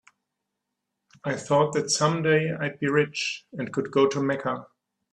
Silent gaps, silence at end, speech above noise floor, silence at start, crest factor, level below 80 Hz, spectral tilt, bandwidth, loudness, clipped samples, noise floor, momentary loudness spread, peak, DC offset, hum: none; 0.5 s; 58 dB; 1.25 s; 18 dB; -68 dBFS; -4.5 dB/octave; 11 kHz; -25 LUFS; under 0.1%; -82 dBFS; 9 LU; -8 dBFS; under 0.1%; none